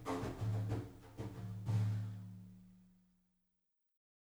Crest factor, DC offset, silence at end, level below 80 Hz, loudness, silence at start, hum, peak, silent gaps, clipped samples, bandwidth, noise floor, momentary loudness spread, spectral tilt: 16 dB; under 0.1%; 1.4 s; -62 dBFS; -42 LUFS; 0 s; none; -26 dBFS; none; under 0.1%; 11.5 kHz; -85 dBFS; 17 LU; -7.5 dB/octave